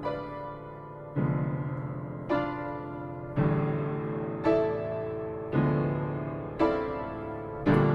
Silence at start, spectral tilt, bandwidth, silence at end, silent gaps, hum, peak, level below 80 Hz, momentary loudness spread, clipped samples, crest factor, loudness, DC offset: 0 s; -10 dB/octave; 5.8 kHz; 0 s; none; none; -12 dBFS; -50 dBFS; 11 LU; under 0.1%; 18 dB; -31 LUFS; under 0.1%